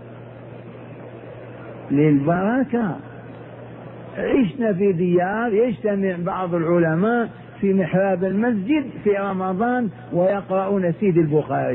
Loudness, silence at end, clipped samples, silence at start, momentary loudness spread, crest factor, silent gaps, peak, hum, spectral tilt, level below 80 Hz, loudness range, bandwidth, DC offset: -20 LUFS; 0 s; under 0.1%; 0 s; 20 LU; 14 dB; none; -6 dBFS; none; -12 dB/octave; -54 dBFS; 3 LU; 3.9 kHz; under 0.1%